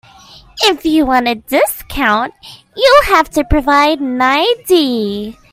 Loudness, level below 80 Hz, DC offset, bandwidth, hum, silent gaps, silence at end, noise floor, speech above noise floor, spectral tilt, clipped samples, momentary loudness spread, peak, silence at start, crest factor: -12 LUFS; -30 dBFS; under 0.1%; 16.5 kHz; none; none; 0.2 s; -40 dBFS; 28 dB; -4 dB/octave; under 0.1%; 10 LU; 0 dBFS; 0.55 s; 14 dB